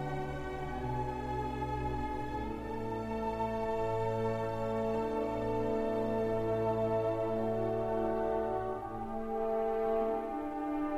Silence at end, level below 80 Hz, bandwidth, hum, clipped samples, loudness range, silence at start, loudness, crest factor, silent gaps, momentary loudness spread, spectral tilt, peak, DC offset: 0 s; -48 dBFS; 14.5 kHz; none; under 0.1%; 4 LU; 0 s; -35 LUFS; 12 dB; none; 6 LU; -8 dB/octave; -22 dBFS; under 0.1%